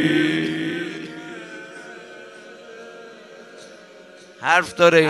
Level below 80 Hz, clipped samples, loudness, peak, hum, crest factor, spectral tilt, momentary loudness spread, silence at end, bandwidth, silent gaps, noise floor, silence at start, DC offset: -64 dBFS; under 0.1%; -20 LUFS; -2 dBFS; none; 22 dB; -5 dB/octave; 24 LU; 0 s; 12.5 kHz; none; -45 dBFS; 0 s; under 0.1%